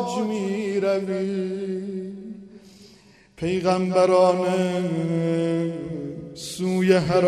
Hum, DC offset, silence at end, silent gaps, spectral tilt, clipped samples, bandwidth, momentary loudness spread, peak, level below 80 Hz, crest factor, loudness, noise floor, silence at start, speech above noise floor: none; under 0.1%; 0 s; none; -6.5 dB/octave; under 0.1%; 13 kHz; 15 LU; -6 dBFS; -58 dBFS; 18 dB; -23 LUFS; -52 dBFS; 0 s; 30 dB